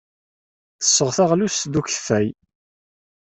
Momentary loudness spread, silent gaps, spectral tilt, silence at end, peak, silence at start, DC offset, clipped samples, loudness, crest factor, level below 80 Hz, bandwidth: 6 LU; none; -3.5 dB/octave; 0.95 s; -4 dBFS; 0.8 s; under 0.1%; under 0.1%; -19 LUFS; 20 dB; -58 dBFS; 8.4 kHz